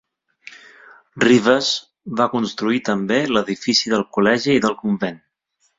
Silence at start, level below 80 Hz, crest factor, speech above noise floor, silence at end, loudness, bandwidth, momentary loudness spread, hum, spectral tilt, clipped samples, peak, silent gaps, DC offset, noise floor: 1.15 s; -58 dBFS; 18 dB; 49 dB; 0.6 s; -18 LUFS; 7.8 kHz; 8 LU; none; -4.5 dB/octave; under 0.1%; -2 dBFS; none; under 0.1%; -67 dBFS